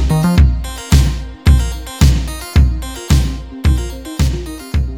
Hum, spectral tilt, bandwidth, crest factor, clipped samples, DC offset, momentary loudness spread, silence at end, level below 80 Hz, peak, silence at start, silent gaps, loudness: none; -6 dB/octave; 17 kHz; 14 dB; under 0.1%; 0.4%; 9 LU; 0 s; -16 dBFS; 0 dBFS; 0 s; none; -16 LUFS